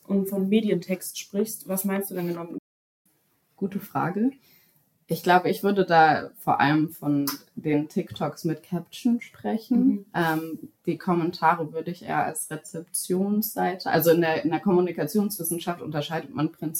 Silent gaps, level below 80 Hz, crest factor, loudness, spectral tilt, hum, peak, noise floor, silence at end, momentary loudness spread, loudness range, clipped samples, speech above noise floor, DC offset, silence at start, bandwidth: 2.59-3.05 s; -72 dBFS; 20 dB; -25 LUFS; -5.5 dB/octave; none; -6 dBFS; -68 dBFS; 0 s; 11 LU; 7 LU; under 0.1%; 43 dB; under 0.1%; 0.1 s; 17 kHz